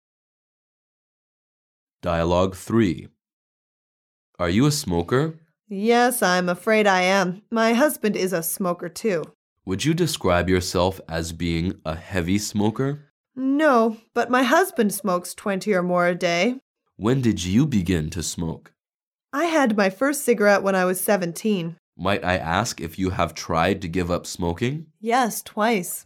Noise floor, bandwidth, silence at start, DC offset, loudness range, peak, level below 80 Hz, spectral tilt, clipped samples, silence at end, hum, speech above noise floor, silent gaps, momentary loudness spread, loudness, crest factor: under -90 dBFS; 17.5 kHz; 2.05 s; under 0.1%; 4 LU; -4 dBFS; -48 dBFS; -5 dB/octave; under 0.1%; 0.05 s; none; over 68 dB; 3.33-4.33 s, 9.35-9.56 s, 13.10-13.24 s, 16.62-16.75 s, 19.07-19.11 s, 21.79-21.93 s; 10 LU; -22 LUFS; 18 dB